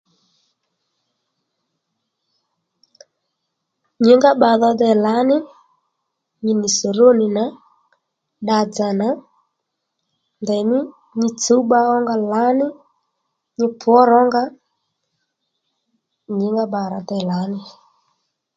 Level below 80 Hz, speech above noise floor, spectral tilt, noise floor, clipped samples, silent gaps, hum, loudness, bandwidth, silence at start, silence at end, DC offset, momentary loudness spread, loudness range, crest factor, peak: -68 dBFS; 61 dB; -5 dB/octave; -76 dBFS; under 0.1%; none; none; -17 LUFS; 9 kHz; 4 s; 0.85 s; under 0.1%; 13 LU; 8 LU; 20 dB; 0 dBFS